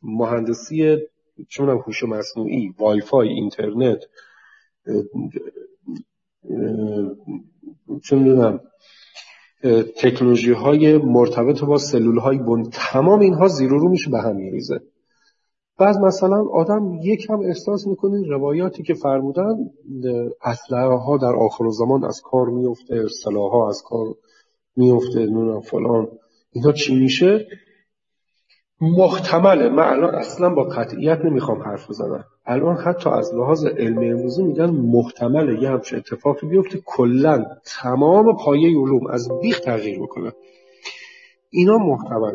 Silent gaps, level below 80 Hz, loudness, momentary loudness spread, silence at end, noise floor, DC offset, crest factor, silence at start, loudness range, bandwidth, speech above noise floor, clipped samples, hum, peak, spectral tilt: none; -64 dBFS; -18 LUFS; 14 LU; 0 s; -79 dBFS; under 0.1%; 18 dB; 0.05 s; 5 LU; 7.6 kHz; 61 dB; under 0.1%; none; 0 dBFS; -7 dB/octave